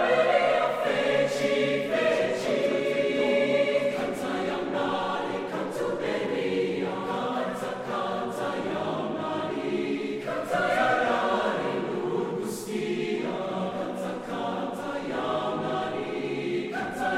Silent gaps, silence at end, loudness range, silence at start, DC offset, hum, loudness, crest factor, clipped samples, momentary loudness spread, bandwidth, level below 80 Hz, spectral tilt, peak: none; 0 s; 5 LU; 0 s; under 0.1%; none; -28 LUFS; 18 dB; under 0.1%; 8 LU; 15.5 kHz; -64 dBFS; -5 dB/octave; -10 dBFS